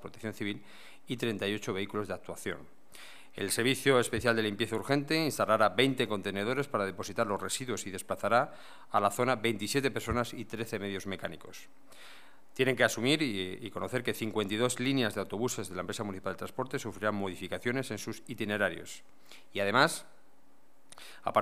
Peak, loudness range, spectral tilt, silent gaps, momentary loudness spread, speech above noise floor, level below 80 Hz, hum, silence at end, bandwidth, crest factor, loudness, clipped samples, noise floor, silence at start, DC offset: -8 dBFS; 6 LU; -4 dB/octave; none; 15 LU; 34 dB; -62 dBFS; none; 0 s; 15.5 kHz; 26 dB; -32 LUFS; under 0.1%; -67 dBFS; 0 s; 0.4%